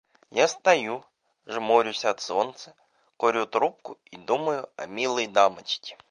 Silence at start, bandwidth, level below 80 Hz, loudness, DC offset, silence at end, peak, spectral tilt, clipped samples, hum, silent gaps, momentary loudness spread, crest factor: 0.35 s; 10.5 kHz; -78 dBFS; -25 LUFS; under 0.1%; 0.15 s; -4 dBFS; -2.5 dB/octave; under 0.1%; none; none; 14 LU; 22 dB